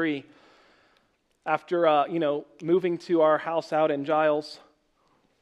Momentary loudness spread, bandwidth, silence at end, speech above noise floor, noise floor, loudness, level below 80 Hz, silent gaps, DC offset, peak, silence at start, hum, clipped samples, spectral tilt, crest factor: 11 LU; 9.8 kHz; 0.85 s; 44 dB; -68 dBFS; -25 LUFS; -78 dBFS; none; under 0.1%; -8 dBFS; 0 s; none; under 0.1%; -6.5 dB/octave; 18 dB